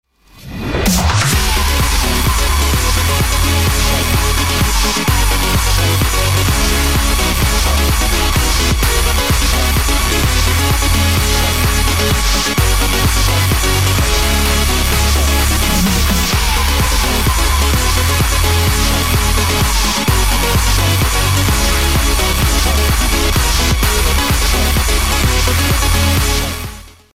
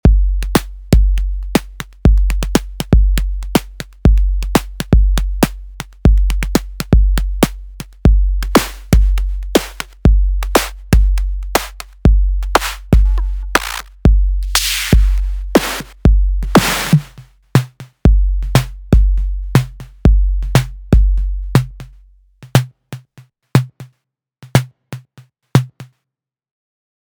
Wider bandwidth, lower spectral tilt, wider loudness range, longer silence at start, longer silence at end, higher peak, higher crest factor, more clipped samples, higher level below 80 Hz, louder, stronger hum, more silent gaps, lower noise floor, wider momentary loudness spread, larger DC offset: second, 16.5 kHz vs over 20 kHz; second, -3.5 dB/octave vs -5.5 dB/octave; second, 0 LU vs 6 LU; about the same, 0.05 s vs 0.05 s; second, 0 s vs 1.15 s; about the same, 0 dBFS vs 0 dBFS; about the same, 12 dB vs 14 dB; neither; about the same, -16 dBFS vs -16 dBFS; first, -13 LUFS vs -16 LUFS; neither; neither; second, -35 dBFS vs -81 dBFS; second, 1 LU vs 7 LU; first, 2% vs under 0.1%